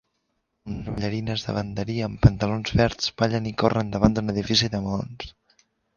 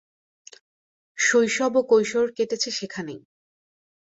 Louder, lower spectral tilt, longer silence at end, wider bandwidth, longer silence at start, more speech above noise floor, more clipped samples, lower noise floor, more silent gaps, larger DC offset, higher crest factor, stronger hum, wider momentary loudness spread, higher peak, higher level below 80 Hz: about the same, -24 LUFS vs -22 LUFS; first, -6 dB/octave vs -2.5 dB/octave; second, 0.65 s vs 0.85 s; second, 7.2 kHz vs 8 kHz; second, 0.65 s vs 1.15 s; second, 51 dB vs over 68 dB; neither; second, -75 dBFS vs under -90 dBFS; neither; neither; first, 24 dB vs 18 dB; neither; second, 14 LU vs 17 LU; first, 0 dBFS vs -8 dBFS; first, -38 dBFS vs -70 dBFS